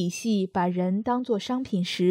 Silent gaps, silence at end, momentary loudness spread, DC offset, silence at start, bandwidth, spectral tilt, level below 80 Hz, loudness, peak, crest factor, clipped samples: none; 0 s; 3 LU; under 0.1%; 0 s; 15 kHz; -6 dB/octave; -62 dBFS; -26 LUFS; -12 dBFS; 14 dB; under 0.1%